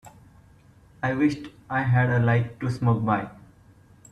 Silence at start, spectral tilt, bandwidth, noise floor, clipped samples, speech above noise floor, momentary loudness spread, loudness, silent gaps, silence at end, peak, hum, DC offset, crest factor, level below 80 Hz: 0.05 s; -8.5 dB/octave; 9 kHz; -54 dBFS; under 0.1%; 31 dB; 9 LU; -24 LUFS; none; 0.75 s; -10 dBFS; none; under 0.1%; 16 dB; -56 dBFS